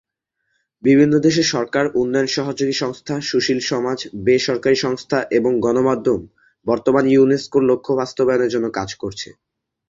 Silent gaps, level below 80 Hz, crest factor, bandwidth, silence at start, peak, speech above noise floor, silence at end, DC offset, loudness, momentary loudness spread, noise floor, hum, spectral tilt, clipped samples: none; -54 dBFS; 16 dB; 7.6 kHz; 0.85 s; -2 dBFS; 56 dB; 0.65 s; under 0.1%; -18 LUFS; 10 LU; -74 dBFS; none; -5 dB/octave; under 0.1%